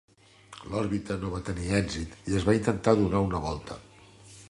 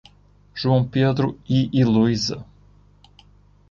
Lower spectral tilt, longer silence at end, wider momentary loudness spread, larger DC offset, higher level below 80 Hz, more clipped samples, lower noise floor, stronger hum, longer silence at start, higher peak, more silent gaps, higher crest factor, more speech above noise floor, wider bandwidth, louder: about the same, -6.5 dB/octave vs -6.5 dB/octave; second, 0 s vs 1.25 s; first, 16 LU vs 9 LU; neither; first, -44 dBFS vs -50 dBFS; neither; about the same, -52 dBFS vs -53 dBFS; second, none vs 50 Hz at -45 dBFS; about the same, 0.5 s vs 0.55 s; about the same, -6 dBFS vs -6 dBFS; neither; first, 22 dB vs 16 dB; second, 24 dB vs 34 dB; first, 11.5 kHz vs 7.4 kHz; second, -28 LUFS vs -20 LUFS